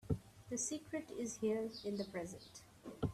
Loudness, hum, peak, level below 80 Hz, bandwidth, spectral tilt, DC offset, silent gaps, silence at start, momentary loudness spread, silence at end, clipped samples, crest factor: -43 LUFS; none; -26 dBFS; -62 dBFS; 14.5 kHz; -5 dB/octave; under 0.1%; none; 0.05 s; 15 LU; 0 s; under 0.1%; 18 dB